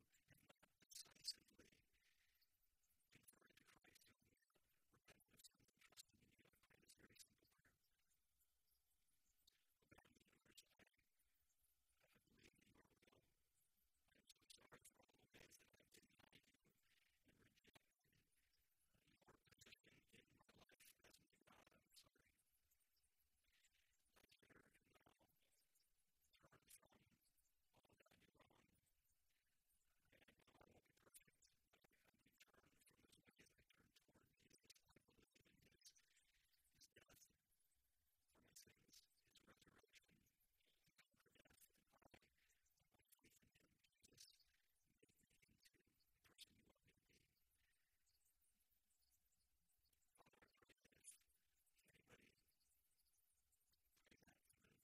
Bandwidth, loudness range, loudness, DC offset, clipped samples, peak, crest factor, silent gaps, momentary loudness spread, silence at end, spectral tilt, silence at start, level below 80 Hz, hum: 15.5 kHz; 1 LU; -63 LUFS; under 0.1%; under 0.1%; -36 dBFS; 38 dB; none; 15 LU; 0 s; -1.5 dB/octave; 0 s; under -90 dBFS; none